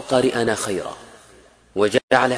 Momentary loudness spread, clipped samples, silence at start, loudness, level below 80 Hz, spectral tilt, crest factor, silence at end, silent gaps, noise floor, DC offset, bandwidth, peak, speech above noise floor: 15 LU; under 0.1%; 0 s; -21 LUFS; -54 dBFS; -4 dB/octave; 20 dB; 0 s; 2.03-2.08 s; -50 dBFS; under 0.1%; 11 kHz; -2 dBFS; 31 dB